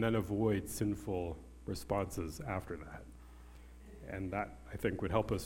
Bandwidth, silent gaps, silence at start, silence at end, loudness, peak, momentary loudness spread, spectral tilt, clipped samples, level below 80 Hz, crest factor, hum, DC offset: 17 kHz; none; 0 s; 0 s; -38 LUFS; -18 dBFS; 22 LU; -6.5 dB/octave; under 0.1%; -52 dBFS; 20 dB; none; under 0.1%